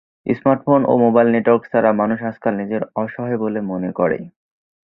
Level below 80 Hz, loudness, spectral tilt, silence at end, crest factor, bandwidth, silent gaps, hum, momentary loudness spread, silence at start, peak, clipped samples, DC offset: -58 dBFS; -18 LUFS; -11.5 dB/octave; 0.65 s; 16 dB; 4 kHz; none; none; 10 LU; 0.25 s; -2 dBFS; under 0.1%; under 0.1%